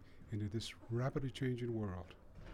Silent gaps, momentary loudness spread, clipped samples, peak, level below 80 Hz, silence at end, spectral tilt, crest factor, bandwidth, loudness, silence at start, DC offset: none; 11 LU; under 0.1%; -26 dBFS; -60 dBFS; 0 s; -6.5 dB/octave; 16 dB; 13 kHz; -42 LUFS; 0 s; under 0.1%